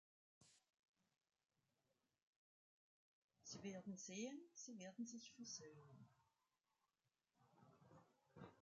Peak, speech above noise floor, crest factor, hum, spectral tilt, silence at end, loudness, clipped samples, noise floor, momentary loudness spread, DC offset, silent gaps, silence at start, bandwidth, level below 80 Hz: -40 dBFS; over 34 dB; 22 dB; none; -3.5 dB/octave; 0 s; -56 LUFS; under 0.1%; under -90 dBFS; 13 LU; under 0.1%; 0.79-0.94 s, 2.23-3.29 s; 0.4 s; 9 kHz; under -90 dBFS